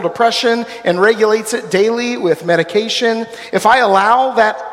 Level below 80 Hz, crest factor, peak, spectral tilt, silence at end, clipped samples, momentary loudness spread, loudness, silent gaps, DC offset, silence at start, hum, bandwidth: -58 dBFS; 14 dB; 0 dBFS; -3.5 dB/octave; 0 s; under 0.1%; 6 LU; -13 LUFS; none; under 0.1%; 0 s; none; 16 kHz